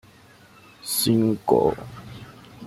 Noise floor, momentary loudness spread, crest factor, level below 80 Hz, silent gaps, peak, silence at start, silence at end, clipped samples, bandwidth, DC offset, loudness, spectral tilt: -51 dBFS; 22 LU; 20 dB; -54 dBFS; none; -4 dBFS; 0.85 s; 0 s; under 0.1%; 16 kHz; under 0.1%; -21 LUFS; -5 dB/octave